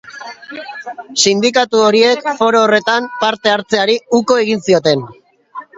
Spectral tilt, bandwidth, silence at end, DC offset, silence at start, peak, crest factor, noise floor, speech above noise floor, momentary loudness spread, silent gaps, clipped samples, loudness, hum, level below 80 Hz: -3 dB/octave; 8 kHz; 0.15 s; under 0.1%; 0.05 s; 0 dBFS; 14 dB; -34 dBFS; 21 dB; 18 LU; none; under 0.1%; -13 LUFS; none; -60 dBFS